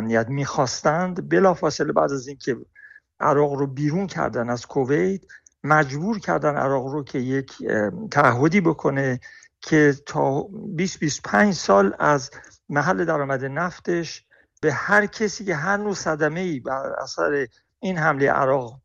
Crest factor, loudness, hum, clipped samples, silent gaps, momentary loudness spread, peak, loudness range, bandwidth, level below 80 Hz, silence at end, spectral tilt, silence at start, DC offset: 18 dB; -22 LUFS; none; under 0.1%; none; 10 LU; -4 dBFS; 3 LU; 8.2 kHz; -56 dBFS; 0.05 s; -5.5 dB/octave; 0 s; under 0.1%